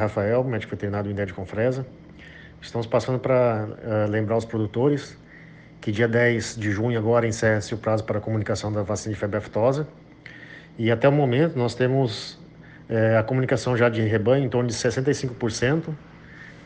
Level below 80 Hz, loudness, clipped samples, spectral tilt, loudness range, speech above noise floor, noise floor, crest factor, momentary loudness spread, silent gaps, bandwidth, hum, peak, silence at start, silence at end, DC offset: -54 dBFS; -23 LUFS; under 0.1%; -6.5 dB/octave; 3 LU; 23 dB; -46 dBFS; 18 dB; 15 LU; none; 9.6 kHz; none; -6 dBFS; 0 s; 0 s; under 0.1%